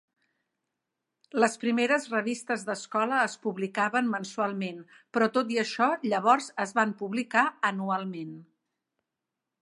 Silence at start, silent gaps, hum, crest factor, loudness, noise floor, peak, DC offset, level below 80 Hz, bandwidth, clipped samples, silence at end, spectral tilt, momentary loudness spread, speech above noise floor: 1.35 s; none; none; 22 dB; -28 LUFS; -87 dBFS; -8 dBFS; under 0.1%; -84 dBFS; 11.5 kHz; under 0.1%; 1.2 s; -4.5 dB/octave; 9 LU; 59 dB